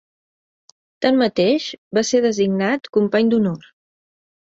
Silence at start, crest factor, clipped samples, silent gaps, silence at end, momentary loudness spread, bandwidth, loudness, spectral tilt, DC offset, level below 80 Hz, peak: 1 s; 16 dB; under 0.1%; 1.78-1.91 s; 1 s; 6 LU; 8 kHz; -18 LUFS; -5 dB/octave; under 0.1%; -62 dBFS; -4 dBFS